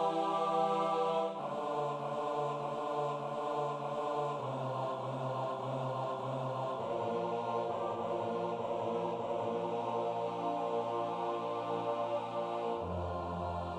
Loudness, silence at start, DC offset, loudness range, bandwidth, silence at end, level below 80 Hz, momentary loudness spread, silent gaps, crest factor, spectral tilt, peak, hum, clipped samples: -36 LUFS; 0 s; under 0.1%; 2 LU; 11.5 kHz; 0 s; -66 dBFS; 5 LU; none; 16 dB; -7 dB/octave; -20 dBFS; none; under 0.1%